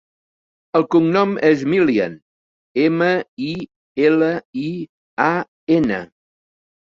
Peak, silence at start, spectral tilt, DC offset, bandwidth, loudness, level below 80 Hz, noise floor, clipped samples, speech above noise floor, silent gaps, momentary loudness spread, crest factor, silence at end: -2 dBFS; 0.75 s; -7.5 dB/octave; under 0.1%; 7.2 kHz; -18 LUFS; -58 dBFS; under -90 dBFS; under 0.1%; over 73 dB; 2.22-2.75 s, 3.28-3.37 s, 3.76-3.95 s, 4.45-4.53 s, 4.89-5.17 s, 5.48-5.67 s; 11 LU; 18 dB; 0.8 s